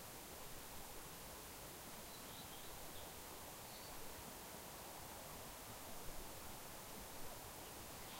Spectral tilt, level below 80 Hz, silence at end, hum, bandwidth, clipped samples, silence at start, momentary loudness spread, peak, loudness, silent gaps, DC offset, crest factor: -2.5 dB/octave; -64 dBFS; 0 s; none; 16 kHz; under 0.1%; 0 s; 1 LU; -36 dBFS; -52 LUFS; none; under 0.1%; 16 dB